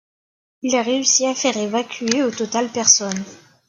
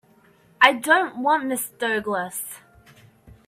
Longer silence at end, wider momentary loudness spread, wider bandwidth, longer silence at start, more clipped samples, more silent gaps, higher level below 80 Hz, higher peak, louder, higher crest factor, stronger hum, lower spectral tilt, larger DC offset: second, 0.3 s vs 0.9 s; about the same, 13 LU vs 14 LU; second, 11 kHz vs 16 kHz; about the same, 0.65 s vs 0.6 s; neither; neither; second, -68 dBFS vs -62 dBFS; about the same, 0 dBFS vs 0 dBFS; first, -18 LUFS vs -21 LUFS; about the same, 20 dB vs 24 dB; neither; about the same, -1.5 dB/octave vs -2 dB/octave; neither